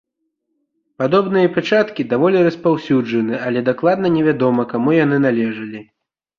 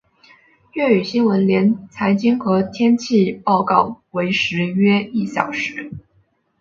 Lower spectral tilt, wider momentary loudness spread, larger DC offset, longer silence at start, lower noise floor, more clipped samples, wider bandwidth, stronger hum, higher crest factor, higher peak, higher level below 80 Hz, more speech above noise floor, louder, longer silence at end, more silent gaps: first, -8 dB/octave vs -6.5 dB/octave; about the same, 6 LU vs 8 LU; neither; first, 1 s vs 0.75 s; first, -73 dBFS vs -61 dBFS; neither; about the same, 7 kHz vs 7.4 kHz; neither; about the same, 16 dB vs 18 dB; about the same, -2 dBFS vs 0 dBFS; about the same, -58 dBFS vs -58 dBFS; first, 57 dB vs 44 dB; about the same, -16 LUFS vs -18 LUFS; about the same, 0.55 s vs 0.6 s; neither